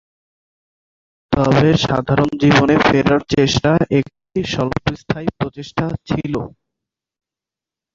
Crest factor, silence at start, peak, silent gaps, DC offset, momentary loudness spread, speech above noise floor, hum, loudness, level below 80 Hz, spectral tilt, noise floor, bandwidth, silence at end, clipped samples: 16 dB; 1.3 s; -2 dBFS; none; under 0.1%; 11 LU; 72 dB; none; -17 LUFS; -40 dBFS; -6 dB/octave; -88 dBFS; 7.6 kHz; 1.45 s; under 0.1%